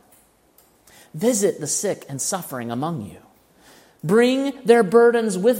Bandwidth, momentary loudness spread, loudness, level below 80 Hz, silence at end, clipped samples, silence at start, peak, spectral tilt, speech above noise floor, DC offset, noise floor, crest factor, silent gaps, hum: 16.5 kHz; 15 LU; -20 LUFS; -66 dBFS; 0 s; under 0.1%; 1.15 s; -2 dBFS; -4.5 dB/octave; 38 dB; under 0.1%; -57 dBFS; 20 dB; none; none